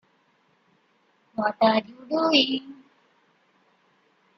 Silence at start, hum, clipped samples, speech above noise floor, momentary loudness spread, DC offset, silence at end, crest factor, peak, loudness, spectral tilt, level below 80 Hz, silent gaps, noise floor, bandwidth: 1.4 s; none; under 0.1%; 43 dB; 14 LU; under 0.1%; 1.65 s; 22 dB; -6 dBFS; -23 LUFS; -4.5 dB/octave; -72 dBFS; none; -66 dBFS; 6.2 kHz